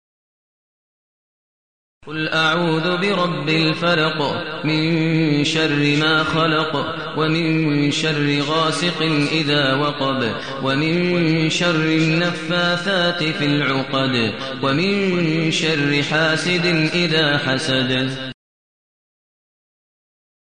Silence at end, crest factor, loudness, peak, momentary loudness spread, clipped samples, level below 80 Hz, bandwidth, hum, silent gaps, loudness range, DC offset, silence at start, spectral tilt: 2.1 s; 14 dB; -18 LUFS; -6 dBFS; 5 LU; under 0.1%; -54 dBFS; 10 kHz; none; none; 3 LU; 0.7%; 2.05 s; -5 dB/octave